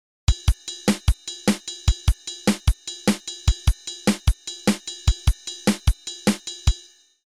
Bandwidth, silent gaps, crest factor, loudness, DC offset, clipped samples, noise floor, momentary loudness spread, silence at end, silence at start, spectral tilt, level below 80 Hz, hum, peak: 14 kHz; none; 16 dB; -24 LUFS; 0.1%; under 0.1%; -48 dBFS; 3 LU; 0.45 s; 0.3 s; -4.5 dB/octave; -26 dBFS; none; -6 dBFS